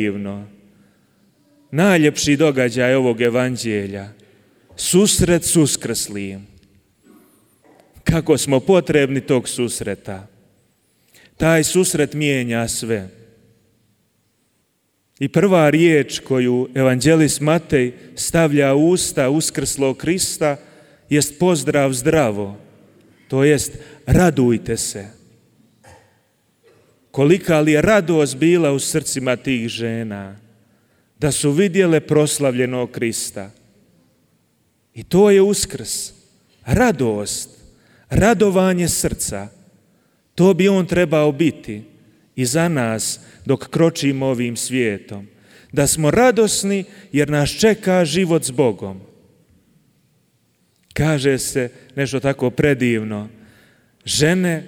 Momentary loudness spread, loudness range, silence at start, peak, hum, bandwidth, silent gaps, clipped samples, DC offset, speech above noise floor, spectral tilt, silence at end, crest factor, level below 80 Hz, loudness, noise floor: 15 LU; 5 LU; 0 s; -2 dBFS; none; 18 kHz; none; under 0.1%; under 0.1%; 49 dB; -5 dB/octave; 0 s; 16 dB; -42 dBFS; -17 LUFS; -66 dBFS